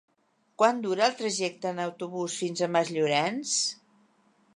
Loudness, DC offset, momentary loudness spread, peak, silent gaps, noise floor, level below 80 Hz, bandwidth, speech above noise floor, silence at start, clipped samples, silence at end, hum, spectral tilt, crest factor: -28 LUFS; under 0.1%; 8 LU; -8 dBFS; none; -70 dBFS; -82 dBFS; 11.5 kHz; 42 dB; 0.6 s; under 0.1%; 0.85 s; none; -3 dB/octave; 20 dB